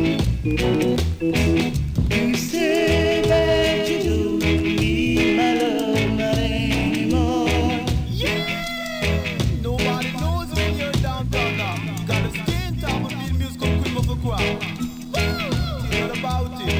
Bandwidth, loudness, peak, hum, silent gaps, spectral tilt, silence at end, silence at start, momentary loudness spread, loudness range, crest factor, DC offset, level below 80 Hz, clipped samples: 16 kHz; -21 LUFS; -8 dBFS; none; none; -5.5 dB/octave; 0 s; 0 s; 6 LU; 4 LU; 12 dB; under 0.1%; -30 dBFS; under 0.1%